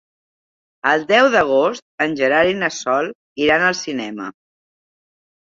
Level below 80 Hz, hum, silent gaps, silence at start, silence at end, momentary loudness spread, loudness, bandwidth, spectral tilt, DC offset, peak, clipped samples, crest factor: -56 dBFS; none; 1.82-1.98 s, 3.15-3.36 s; 0.85 s; 1.2 s; 13 LU; -17 LUFS; 7.6 kHz; -3.5 dB/octave; under 0.1%; -2 dBFS; under 0.1%; 18 dB